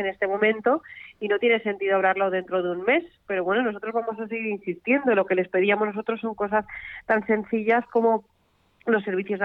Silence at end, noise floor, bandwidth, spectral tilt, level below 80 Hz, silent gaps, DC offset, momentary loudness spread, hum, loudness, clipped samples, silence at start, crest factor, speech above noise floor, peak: 0 s; -63 dBFS; 4.1 kHz; -8 dB/octave; -64 dBFS; none; under 0.1%; 8 LU; none; -24 LUFS; under 0.1%; 0 s; 16 dB; 39 dB; -8 dBFS